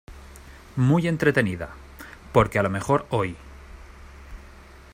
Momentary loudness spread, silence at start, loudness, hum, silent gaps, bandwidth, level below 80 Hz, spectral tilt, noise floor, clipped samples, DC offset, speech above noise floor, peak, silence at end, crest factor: 25 LU; 0.1 s; -23 LUFS; none; none; 16 kHz; -46 dBFS; -7 dB/octave; -46 dBFS; under 0.1%; under 0.1%; 24 dB; -4 dBFS; 0.3 s; 22 dB